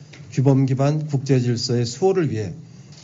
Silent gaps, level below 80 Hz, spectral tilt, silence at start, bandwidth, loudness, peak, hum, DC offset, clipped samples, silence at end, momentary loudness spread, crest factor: none; -58 dBFS; -7.5 dB/octave; 0 s; 7.8 kHz; -20 LUFS; -4 dBFS; none; under 0.1%; under 0.1%; 0 s; 11 LU; 16 dB